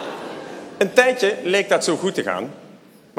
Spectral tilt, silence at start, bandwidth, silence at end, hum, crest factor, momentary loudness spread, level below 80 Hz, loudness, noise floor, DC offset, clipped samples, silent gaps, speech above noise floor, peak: -3.5 dB/octave; 0 s; 15.5 kHz; 0.45 s; none; 22 dB; 18 LU; -70 dBFS; -19 LUFS; -47 dBFS; under 0.1%; under 0.1%; none; 28 dB; 0 dBFS